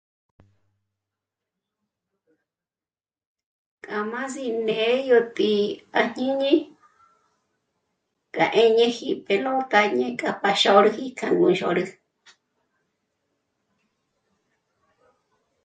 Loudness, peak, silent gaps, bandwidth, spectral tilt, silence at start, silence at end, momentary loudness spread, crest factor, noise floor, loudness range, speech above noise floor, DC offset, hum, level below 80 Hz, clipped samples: -22 LUFS; -2 dBFS; none; 9.2 kHz; -4.5 dB/octave; 3.9 s; 3.75 s; 12 LU; 24 dB; under -90 dBFS; 12 LU; over 69 dB; under 0.1%; none; -72 dBFS; under 0.1%